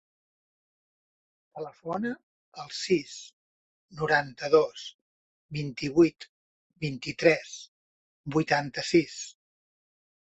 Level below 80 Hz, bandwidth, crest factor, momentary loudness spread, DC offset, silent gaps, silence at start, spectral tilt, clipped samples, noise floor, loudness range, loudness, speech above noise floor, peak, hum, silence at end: -66 dBFS; 8.2 kHz; 24 dB; 20 LU; under 0.1%; 2.23-2.52 s, 3.33-3.88 s, 4.94-5.49 s, 6.29-6.70 s, 7.68-8.24 s; 1.55 s; -5 dB/octave; under 0.1%; under -90 dBFS; 7 LU; -27 LUFS; over 62 dB; -6 dBFS; none; 0.95 s